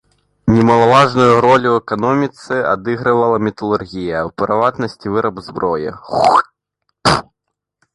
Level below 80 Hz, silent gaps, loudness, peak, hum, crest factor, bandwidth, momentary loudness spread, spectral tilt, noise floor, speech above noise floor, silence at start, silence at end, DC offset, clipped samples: -44 dBFS; none; -15 LUFS; 0 dBFS; none; 14 dB; 11.5 kHz; 11 LU; -6 dB/octave; -77 dBFS; 63 dB; 0.45 s; 0.75 s; under 0.1%; under 0.1%